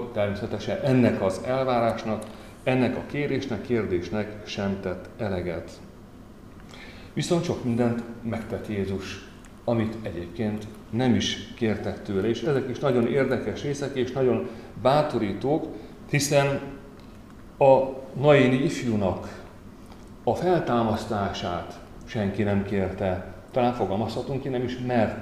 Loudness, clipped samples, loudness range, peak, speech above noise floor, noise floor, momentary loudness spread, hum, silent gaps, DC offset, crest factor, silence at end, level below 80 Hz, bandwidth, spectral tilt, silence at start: -26 LUFS; under 0.1%; 7 LU; -6 dBFS; 21 dB; -46 dBFS; 18 LU; none; none; 0.1%; 20 dB; 0 s; -50 dBFS; 15 kHz; -6 dB/octave; 0 s